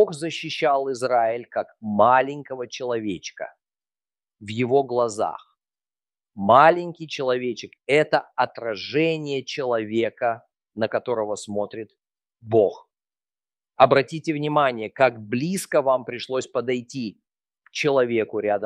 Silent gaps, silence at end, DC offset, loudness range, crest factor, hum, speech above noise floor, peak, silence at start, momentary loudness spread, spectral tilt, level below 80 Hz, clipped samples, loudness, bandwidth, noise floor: none; 0 s; under 0.1%; 6 LU; 22 dB; none; over 68 dB; -2 dBFS; 0 s; 15 LU; -5 dB/octave; -70 dBFS; under 0.1%; -23 LUFS; 14 kHz; under -90 dBFS